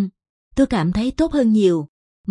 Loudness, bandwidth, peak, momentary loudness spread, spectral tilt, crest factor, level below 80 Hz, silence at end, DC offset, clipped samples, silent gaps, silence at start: -19 LUFS; 11 kHz; -6 dBFS; 13 LU; -7 dB/octave; 14 dB; -40 dBFS; 0 s; under 0.1%; under 0.1%; 0.29-0.51 s, 1.89-2.24 s; 0 s